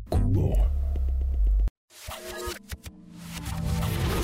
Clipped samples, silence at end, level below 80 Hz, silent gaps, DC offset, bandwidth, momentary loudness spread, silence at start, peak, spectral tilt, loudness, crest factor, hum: under 0.1%; 0 s; -28 dBFS; 1.70-1.88 s; under 0.1%; 16 kHz; 17 LU; 0 s; -14 dBFS; -6 dB/octave; -29 LUFS; 12 dB; none